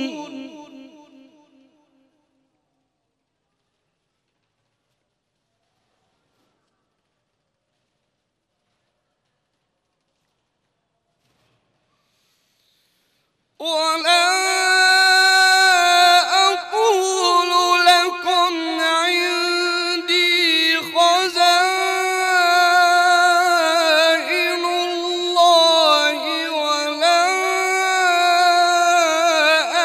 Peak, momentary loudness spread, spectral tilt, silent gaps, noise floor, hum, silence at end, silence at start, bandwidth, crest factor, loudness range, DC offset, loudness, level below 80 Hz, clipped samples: -4 dBFS; 8 LU; 1 dB/octave; none; -75 dBFS; none; 0 s; 0 s; 16 kHz; 14 dB; 3 LU; under 0.1%; -15 LUFS; -72 dBFS; under 0.1%